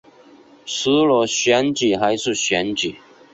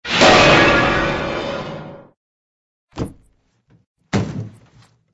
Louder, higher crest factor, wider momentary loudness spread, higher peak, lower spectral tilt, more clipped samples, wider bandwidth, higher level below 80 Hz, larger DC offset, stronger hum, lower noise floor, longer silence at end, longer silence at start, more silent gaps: second, -18 LUFS vs -14 LUFS; about the same, 16 dB vs 18 dB; second, 9 LU vs 22 LU; second, -4 dBFS vs 0 dBFS; about the same, -3 dB/octave vs -4 dB/octave; neither; second, 8.2 kHz vs 11 kHz; second, -58 dBFS vs -38 dBFS; neither; neither; second, -48 dBFS vs -59 dBFS; second, 0.35 s vs 0.65 s; first, 0.65 s vs 0.05 s; second, none vs 2.17-2.88 s, 3.86-3.95 s